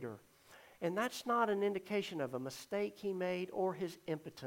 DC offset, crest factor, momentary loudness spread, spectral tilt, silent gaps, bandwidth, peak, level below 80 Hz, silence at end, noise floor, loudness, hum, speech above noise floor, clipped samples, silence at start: under 0.1%; 18 dB; 9 LU; -5 dB/octave; none; 16.5 kHz; -20 dBFS; -80 dBFS; 0 s; -61 dBFS; -39 LUFS; none; 23 dB; under 0.1%; 0 s